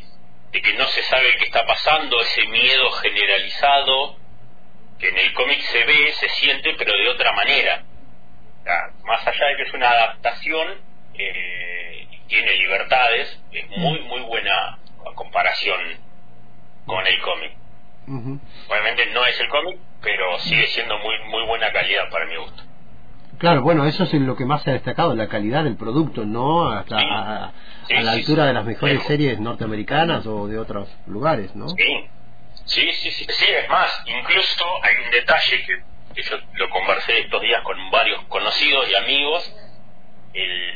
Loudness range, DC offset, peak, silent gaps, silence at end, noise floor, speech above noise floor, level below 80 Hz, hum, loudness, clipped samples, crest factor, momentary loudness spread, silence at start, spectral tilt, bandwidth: 6 LU; 4%; -4 dBFS; none; 0 s; -50 dBFS; 30 dB; -48 dBFS; none; -18 LUFS; under 0.1%; 16 dB; 13 LU; 0.55 s; -5.5 dB/octave; 5 kHz